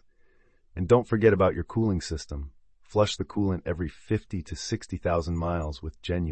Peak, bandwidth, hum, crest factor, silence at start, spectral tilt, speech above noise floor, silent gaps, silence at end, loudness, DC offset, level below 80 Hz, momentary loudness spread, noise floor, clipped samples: -8 dBFS; 8.8 kHz; none; 20 dB; 0.75 s; -6.5 dB/octave; 34 dB; none; 0 s; -27 LUFS; under 0.1%; -44 dBFS; 14 LU; -60 dBFS; under 0.1%